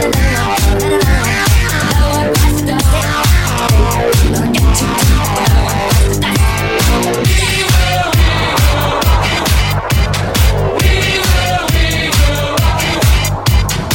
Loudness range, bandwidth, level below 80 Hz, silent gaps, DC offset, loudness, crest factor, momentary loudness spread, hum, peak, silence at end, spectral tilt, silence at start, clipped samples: 1 LU; 17 kHz; -14 dBFS; none; under 0.1%; -12 LUFS; 10 dB; 2 LU; none; 0 dBFS; 0 s; -4.5 dB/octave; 0 s; under 0.1%